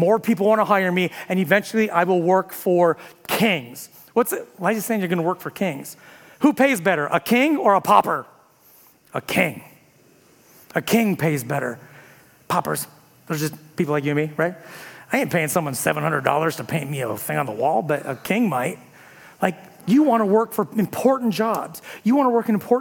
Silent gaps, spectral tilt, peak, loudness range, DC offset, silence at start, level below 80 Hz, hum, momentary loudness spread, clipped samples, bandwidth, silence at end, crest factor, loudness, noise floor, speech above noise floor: none; -5.5 dB/octave; 0 dBFS; 5 LU; under 0.1%; 0 s; -68 dBFS; none; 11 LU; under 0.1%; 18 kHz; 0 s; 20 dB; -21 LUFS; -54 dBFS; 34 dB